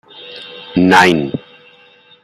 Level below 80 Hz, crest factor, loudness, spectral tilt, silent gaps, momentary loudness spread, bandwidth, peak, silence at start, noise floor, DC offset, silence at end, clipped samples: -52 dBFS; 16 dB; -12 LUFS; -5 dB/octave; none; 22 LU; 15.5 kHz; 0 dBFS; 0.2 s; -46 dBFS; under 0.1%; 0.85 s; under 0.1%